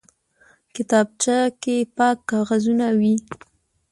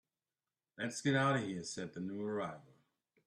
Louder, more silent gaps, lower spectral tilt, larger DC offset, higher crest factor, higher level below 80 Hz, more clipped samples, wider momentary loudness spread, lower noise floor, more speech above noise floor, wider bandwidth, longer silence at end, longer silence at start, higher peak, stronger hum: first, -20 LUFS vs -38 LUFS; neither; about the same, -4.5 dB/octave vs -5 dB/octave; neither; about the same, 16 dB vs 18 dB; first, -64 dBFS vs -78 dBFS; neither; about the same, 13 LU vs 11 LU; second, -58 dBFS vs under -90 dBFS; second, 38 dB vs over 53 dB; about the same, 11.5 kHz vs 12.5 kHz; about the same, 0.55 s vs 0.65 s; about the same, 0.75 s vs 0.8 s; first, -6 dBFS vs -20 dBFS; neither